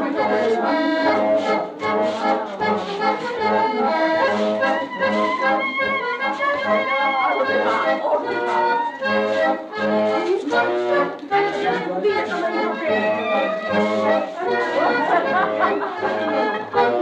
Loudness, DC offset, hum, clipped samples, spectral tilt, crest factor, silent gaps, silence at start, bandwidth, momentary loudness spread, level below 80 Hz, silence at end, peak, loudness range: -20 LUFS; under 0.1%; none; under 0.1%; -5 dB/octave; 12 dB; none; 0 s; 9.2 kHz; 3 LU; -64 dBFS; 0 s; -6 dBFS; 1 LU